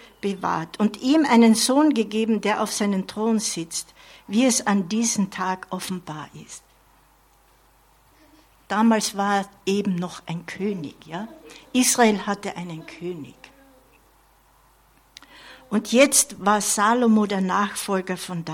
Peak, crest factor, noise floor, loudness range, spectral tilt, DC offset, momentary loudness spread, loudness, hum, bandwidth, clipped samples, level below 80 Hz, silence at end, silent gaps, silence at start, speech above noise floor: -4 dBFS; 20 dB; -58 dBFS; 12 LU; -3.5 dB/octave; under 0.1%; 17 LU; -22 LUFS; none; 16.5 kHz; under 0.1%; -62 dBFS; 0 s; none; 0.25 s; 36 dB